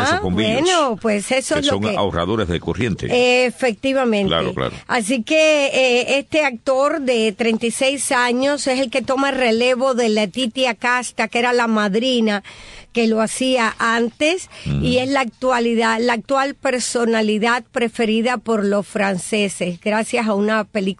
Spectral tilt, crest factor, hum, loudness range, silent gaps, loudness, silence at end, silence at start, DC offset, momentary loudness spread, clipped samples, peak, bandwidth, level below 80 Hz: -4 dB/octave; 14 dB; none; 2 LU; none; -18 LUFS; 0.05 s; 0 s; under 0.1%; 5 LU; under 0.1%; -4 dBFS; 12.5 kHz; -46 dBFS